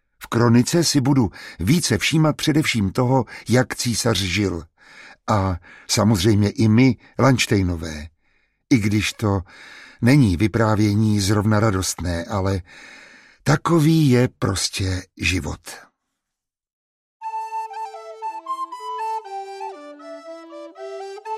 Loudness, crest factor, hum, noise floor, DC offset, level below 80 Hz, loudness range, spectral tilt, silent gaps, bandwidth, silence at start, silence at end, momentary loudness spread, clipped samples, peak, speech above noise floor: -20 LUFS; 18 dB; none; -84 dBFS; under 0.1%; -44 dBFS; 12 LU; -5.5 dB/octave; 16.73-17.20 s; 15 kHz; 0.2 s; 0 s; 19 LU; under 0.1%; -4 dBFS; 65 dB